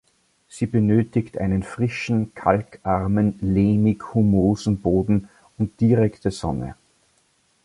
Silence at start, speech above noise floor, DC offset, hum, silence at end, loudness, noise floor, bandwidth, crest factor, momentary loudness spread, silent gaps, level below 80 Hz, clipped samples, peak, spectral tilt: 0.55 s; 43 dB; under 0.1%; none; 0.9 s; -21 LUFS; -64 dBFS; 11.5 kHz; 18 dB; 9 LU; none; -42 dBFS; under 0.1%; -2 dBFS; -8 dB/octave